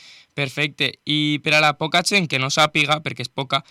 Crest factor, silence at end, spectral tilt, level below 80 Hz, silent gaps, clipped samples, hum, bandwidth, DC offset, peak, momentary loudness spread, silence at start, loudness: 16 dB; 0.1 s; -3.5 dB/octave; -64 dBFS; none; under 0.1%; none; 16 kHz; under 0.1%; -6 dBFS; 10 LU; 0.35 s; -19 LUFS